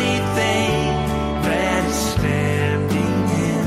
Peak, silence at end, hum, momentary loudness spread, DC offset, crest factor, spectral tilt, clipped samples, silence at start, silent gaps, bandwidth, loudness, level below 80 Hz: -6 dBFS; 0 s; none; 2 LU; under 0.1%; 14 dB; -5.5 dB/octave; under 0.1%; 0 s; none; 16 kHz; -19 LUFS; -34 dBFS